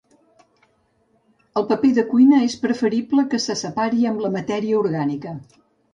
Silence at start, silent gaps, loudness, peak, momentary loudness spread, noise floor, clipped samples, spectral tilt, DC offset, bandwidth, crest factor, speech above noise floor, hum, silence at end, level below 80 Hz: 1.55 s; none; -20 LUFS; -4 dBFS; 11 LU; -63 dBFS; under 0.1%; -5.5 dB/octave; under 0.1%; 9 kHz; 16 dB; 44 dB; none; 0.5 s; -64 dBFS